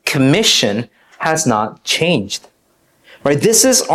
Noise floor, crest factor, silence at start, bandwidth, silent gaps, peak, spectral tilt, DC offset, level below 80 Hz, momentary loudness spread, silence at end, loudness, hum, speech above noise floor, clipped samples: -58 dBFS; 16 dB; 0.05 s; 15.5 kHz; none; 0 dBFS; -3 dB/octave; under 0.1%; -52 dBFS; 14 LU; 0 s; -14 LUFS; none; 44 dB; under 0.1%